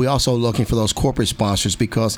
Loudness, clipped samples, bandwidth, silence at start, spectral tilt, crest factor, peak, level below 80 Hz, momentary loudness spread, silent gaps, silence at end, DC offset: -19 LUFS; under 0.1%; 19 kHz; 0 s; -5 dB/octave; 14 dB; -6 dBFS; -34 dBFS; 2 LU; none; 0 s; under 0.1%